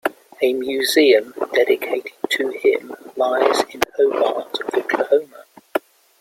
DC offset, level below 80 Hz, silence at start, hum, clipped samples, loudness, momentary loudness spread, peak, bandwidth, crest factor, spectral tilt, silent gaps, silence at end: under 0.1%; -64 dBFS; 0.05 s; none; under 0.1%; -19 LUFS; 12 LU; 0 dBFS; 16.5 kHz; 20 dB; -2 dB/octave; none; 0.4 s